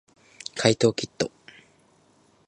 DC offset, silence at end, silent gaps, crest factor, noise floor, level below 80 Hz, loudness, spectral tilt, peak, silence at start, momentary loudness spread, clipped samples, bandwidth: under 0.1%; 1.2 s; none; 26 dB; -61 dBFS; -62 dBFS; -25 LUFS; -4.5 dB/octave; -2 dBFS; 0.55 s; 15 LU; under 0.1%; 10.5 kHz